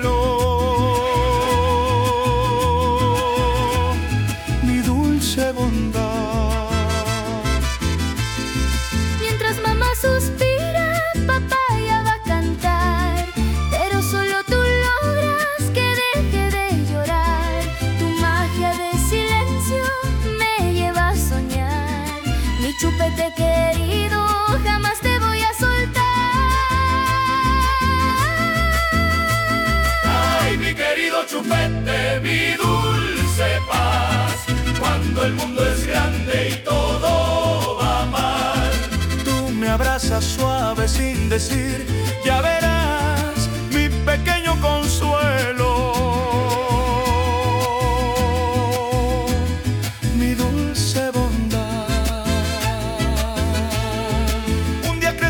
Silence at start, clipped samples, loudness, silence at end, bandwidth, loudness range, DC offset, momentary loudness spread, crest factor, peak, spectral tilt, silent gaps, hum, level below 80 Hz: 0 s; under 0.1%; -19 LUFS; 0 s; 19 kHz; 3 LU; under 0.1%; 4 LU; 12 dB; -6 dBFS; -5 dB/octave; none; none; -26 dBFS